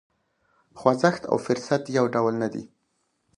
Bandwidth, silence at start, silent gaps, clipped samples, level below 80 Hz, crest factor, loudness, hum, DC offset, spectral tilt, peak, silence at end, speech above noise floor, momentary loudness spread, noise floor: 11 kHz; 0.75 s; none; under 0.1%; -66 dBFS; 22 dB; -24 LUFS; none; under 0.1%; -6 dB/octave; -4 dBFS; 0.7 s; 49 dB; 8 LU; -73 dBFS